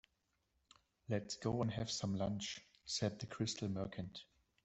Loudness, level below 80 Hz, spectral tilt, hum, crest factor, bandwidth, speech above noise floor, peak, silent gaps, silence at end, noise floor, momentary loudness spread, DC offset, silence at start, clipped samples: -42 LUFS; -68 dBFS; -5 dB/octave; none; 18 dB; 8.2 kHz; 42 dB; -24 dBFS; none; 0.4 s; -84 dBFS; 11 LU; under 0.1%; 1.1 s; under 0.1%